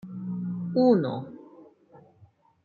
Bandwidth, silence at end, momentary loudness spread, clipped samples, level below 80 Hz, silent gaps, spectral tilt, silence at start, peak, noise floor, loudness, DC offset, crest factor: 4.7 kHz; 0.65 s; 20 LU; under 0.1%; -74 dBFS; none; -10 dB/octave; 0.05 s; -10 dBFS; -59 dBFS; -26 LUFS; under 0.1%; 18 dB